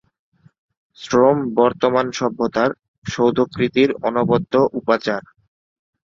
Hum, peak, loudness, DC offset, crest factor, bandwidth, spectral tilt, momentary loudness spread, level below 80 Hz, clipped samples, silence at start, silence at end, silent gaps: none; -2 dBFS; -18 LUFS; under 0.1%; 18 dB; 7.6 kHz; -6 dB/octave; 8 LU; -54 dBFS; under 0.1%; 1 s; 0.95 s; 2.88-3.02 s